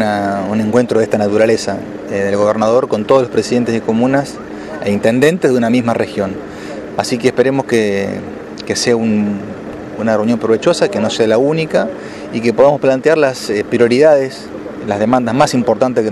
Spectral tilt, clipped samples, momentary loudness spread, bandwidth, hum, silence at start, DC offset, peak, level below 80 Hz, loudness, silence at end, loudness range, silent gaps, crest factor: -5.5 dB/octave; under 0.1%; 13 LU; 13 kHz; none; 0 s; under 0.1%; 0 dBFS; -50 dBFS; -14 LUFS; 0 s; 3 LU; none; 14 dB